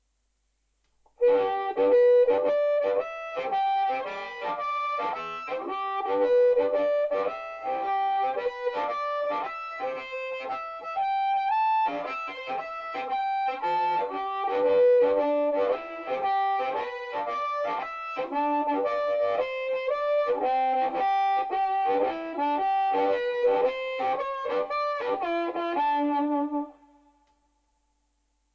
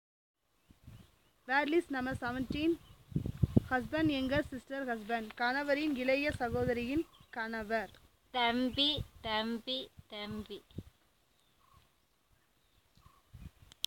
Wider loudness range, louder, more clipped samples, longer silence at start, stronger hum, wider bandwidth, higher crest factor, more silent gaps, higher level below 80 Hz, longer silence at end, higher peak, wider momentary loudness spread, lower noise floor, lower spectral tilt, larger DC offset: second, 5 LU vs 9 LU; first, -27 LUFS vs -35 LUFS; neither; first, 1.2 s vs 0.85 s; neither; second, 6.8 kHz vs 17 kHz; second, 14 dB vs 26 dB; neither; second, -68 dBFS vs -56 dBFS; first, 1.8 s vs 0.4 s; about the same, -12 dBFS vs -10 dBFS; second, 10 LU vs 16 LU; about the same, -74 dBFS vs -73 dBFS; about the same, -5 dB/octave vs -5.5 dB/octave; neither